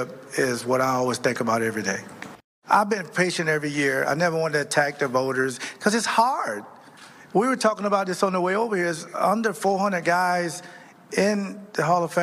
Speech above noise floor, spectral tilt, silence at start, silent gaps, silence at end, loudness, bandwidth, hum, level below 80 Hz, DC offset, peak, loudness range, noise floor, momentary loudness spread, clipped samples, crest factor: 24 dB; -4.5 dB/octave; 0 s; 2.44-2.62 s; 0 s; -23 LUFS; 15.5 kHz; none; -70 dBFS; under 0.1%; -6 dBFS; 1 LU; -47 dBFS; 8 LU; under 0.1%; 18 dB